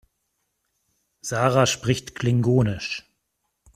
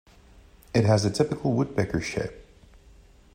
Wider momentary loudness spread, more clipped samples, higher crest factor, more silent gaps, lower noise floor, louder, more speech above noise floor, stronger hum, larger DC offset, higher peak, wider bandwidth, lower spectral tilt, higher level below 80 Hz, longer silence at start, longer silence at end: first, 12 LU vs 9 LU; neither; about the same, 22 dB vs 18 dB; neither; first, -76 dBFS vs -53 dBFS; first, -22 LUFS vs -26 LUFS; first, 54 dB vs 29 dB; neither; neither; first, -4 dBFS vs -8 dBFS; first, 14.5 kHz vs 10.5 kHz; second, -5 dB/octave vs -6.5 dB/octave; about the same, -52 dBFS vs -50 dBFS; first, 1.25 s vs 0.75 s; second, 0.75 s vs 0.95 s